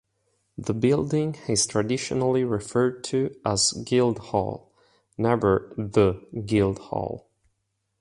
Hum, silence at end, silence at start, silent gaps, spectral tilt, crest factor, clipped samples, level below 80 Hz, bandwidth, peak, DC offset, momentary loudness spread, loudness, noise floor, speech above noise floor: none; 0.8 s; 0.6 s; none; -5 dB/octave; 18 dB; under 0.1%; -50 dBFS; 11.5 kHz; -6 dBFS; under 0.1%; 11 LU; -25 LUFS; -76 dBFS; 52 dB